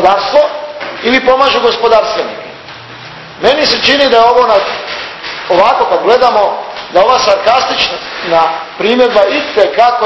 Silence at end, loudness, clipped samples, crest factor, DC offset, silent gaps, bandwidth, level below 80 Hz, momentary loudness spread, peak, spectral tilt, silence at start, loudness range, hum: 0 s; -9 LUFS; 0.7%; 10 dB; under 0.1%; none; 8 kHz; -44 dBFS; 14 LU; 0 dBFS; -3 dB/octave; 0 s; 2 LU; none